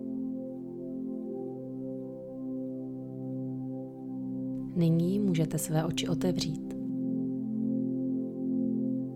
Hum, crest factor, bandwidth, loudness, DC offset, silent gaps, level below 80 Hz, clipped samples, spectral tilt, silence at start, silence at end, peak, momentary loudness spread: none; 16 dB; 16 kHz; -33 LUFS; under 0.1%; none; -62 dBFS; under 0.1%; -6.5 dB/octave; 0 s; 0 s; -16 dBFS; 11 LU